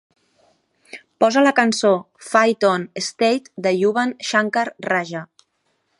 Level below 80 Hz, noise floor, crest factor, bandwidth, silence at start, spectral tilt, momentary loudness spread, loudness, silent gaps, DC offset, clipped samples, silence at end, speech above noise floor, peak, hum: -72 dBFS; -69 dBFS; 20 dB; 11.5 kHz; 0.95 s; -4 dB/octave; 13 LU; -19 LUFS; none; under 0.1%; under 0.1%; 0.75 s; 50 dB; 0 dBFS; none